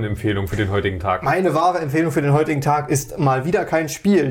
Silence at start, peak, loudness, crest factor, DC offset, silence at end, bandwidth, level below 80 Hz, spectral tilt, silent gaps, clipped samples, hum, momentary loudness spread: 0 s; -6 dBFS; -19 LUFS; 12 dB; under 0.1%; 0 s; 17 kHz; -42 dBFS; -6 dB/octave; none; under 0.1%; none; 4 LU